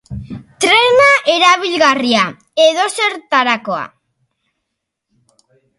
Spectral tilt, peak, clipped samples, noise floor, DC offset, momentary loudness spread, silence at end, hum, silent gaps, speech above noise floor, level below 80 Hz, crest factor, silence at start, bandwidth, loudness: -2.5 dB/octave; 0 dBFS; under 0.1%; -76 dBFS; under 0.1%; 16 LU; 1.9 s; none; none; 62 dB; -48 dBFS; 14 dB; 0.1 s; 11.5 kHz; -12 LUFS